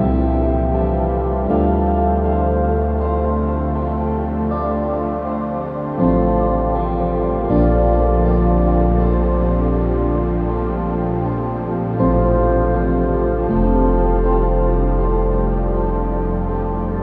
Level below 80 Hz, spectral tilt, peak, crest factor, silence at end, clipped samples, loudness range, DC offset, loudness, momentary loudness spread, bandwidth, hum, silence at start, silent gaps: -20 dBFS; -12.5 dB/octave; -4 dBFS; 14 dB; 0 s; under 0.1%; 3 LU; under 0.1%; -18 LUFS; 6 LU; 3.8 kHz; none; 0 s; none